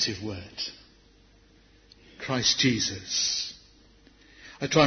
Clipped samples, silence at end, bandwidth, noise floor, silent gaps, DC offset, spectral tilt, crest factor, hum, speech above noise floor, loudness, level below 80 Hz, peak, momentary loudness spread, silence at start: under 0.1%; 0 s; 6.6 kHz; -58 dBFS; none; under 0.1%; -3 dB/octave; 24 dB; none; 32 dB; -27 LUFS; -60 dBFS; -6 dBFS; 16 LU; 0 s